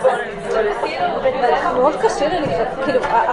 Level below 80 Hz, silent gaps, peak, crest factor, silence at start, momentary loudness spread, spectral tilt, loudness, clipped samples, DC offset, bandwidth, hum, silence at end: -44 dBFS; none; -4 dBFS; 14 dB; 0 s; 4 LU; -5 dB/octave; -18 LUFS; under 0.1%; under 0.1%; 11 kHz; none; 0 s